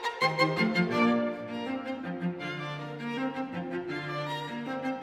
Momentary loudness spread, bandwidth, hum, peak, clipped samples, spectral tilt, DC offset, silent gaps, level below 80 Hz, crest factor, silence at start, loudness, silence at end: 10 LU; 13.5 kHz; none; -12 dBFS; under 0.1%; -6 dB/octave; under 0.1%; none; -72 dBFS; 20 dB; 0 s; -31 LUFS; 0 s